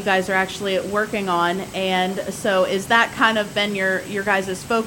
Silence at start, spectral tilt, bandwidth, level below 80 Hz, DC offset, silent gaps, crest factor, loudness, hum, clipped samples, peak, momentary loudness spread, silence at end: 0 s; -4 dB/octave; 17 kHz; -52 dBFS; under 0.1%; none; 18 dB; -20 LUFS; none; under 0.1%; -2 dBFS; 6 LU; 0 s